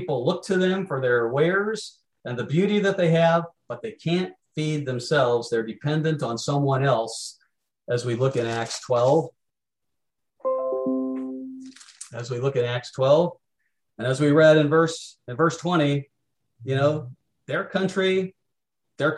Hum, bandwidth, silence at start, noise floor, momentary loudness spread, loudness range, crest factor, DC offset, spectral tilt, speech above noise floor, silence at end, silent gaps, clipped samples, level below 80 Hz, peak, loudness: none; 12 kHz; 0 s; -85 dBFS; 15 LU; 5 LU; 18 dB; under 0.1%; -6 dB/octave; 62 dB; 0 s; none; under 0.1%; -68 dBFS; -6 dBFS; -23 LUFS